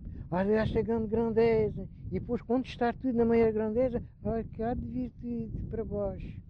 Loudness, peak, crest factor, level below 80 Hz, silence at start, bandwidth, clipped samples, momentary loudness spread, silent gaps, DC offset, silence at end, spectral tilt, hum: -31 LUFS; -16 dBFS; 14 dB; -46 dBFS; 0 s; 6.2 kHz; under 0.1%; 11 LU; none; under 0.1%; 0.05 s; -9.5 dB/octave; none